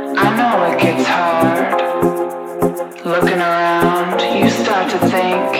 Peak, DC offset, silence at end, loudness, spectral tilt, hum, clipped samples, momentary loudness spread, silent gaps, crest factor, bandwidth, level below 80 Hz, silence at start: -2 dBFS; under 0.1%; 0 s; -15 LUFS; -5.5 dB/octave; none; under 0.1%; 6 LU; none; 14 dB; 17 kHz; -50 dBFS; 0 s